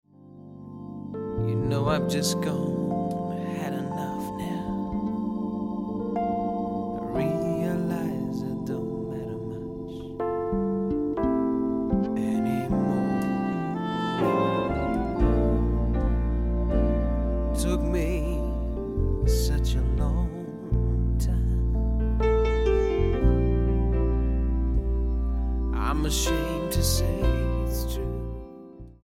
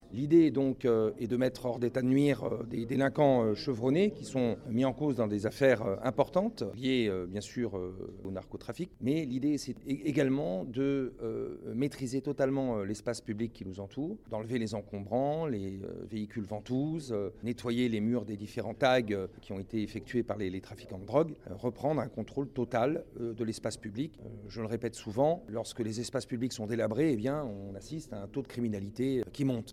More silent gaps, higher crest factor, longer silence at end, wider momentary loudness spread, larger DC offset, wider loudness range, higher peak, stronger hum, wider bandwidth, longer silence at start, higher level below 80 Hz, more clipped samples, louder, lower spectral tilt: neither; about the same, 16 dB vs 20 dB; about the same, 0.1 s vs 0 s; second, 8 LU vs 12 LU; neither; about the same, 5 LU vs 6 LU; first, -8 dBFS vs -12 dBFS; neither; first, 16 kHz vs 14 kHz; first, 0.25 s vs 0 s; first, -28 dBFS vs -60 dBFS; neither; first, -27 LUFS vs -33 LUFS; about the same, -6.5 dB/octave vs -6.5 dB/octave